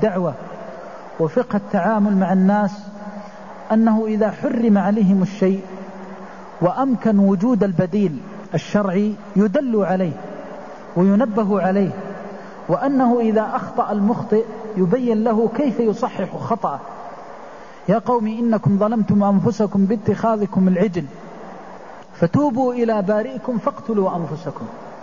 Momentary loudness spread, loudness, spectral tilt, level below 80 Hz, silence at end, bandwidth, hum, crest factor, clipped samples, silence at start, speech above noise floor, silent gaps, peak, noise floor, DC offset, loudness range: 18 LU; -19 LUFS; -9 dB/octave; -56 dBFS; 0 s; 7.2 kHz; none; 14 dB; under 0.1%; 0 s; 20 dB; none; -4 dBFS; -38 dBFS; 0.6%; 3 LU